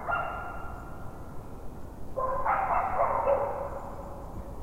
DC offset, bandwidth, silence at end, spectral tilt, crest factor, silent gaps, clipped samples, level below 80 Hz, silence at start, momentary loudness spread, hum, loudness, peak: under 0.1%; 16 kHz; 0 s; -7 dB/octave; 18 dB; none; under 0.1%; -44 dBFS; 0 s; 18 LU; none; -31 LUFS; -14 dBFS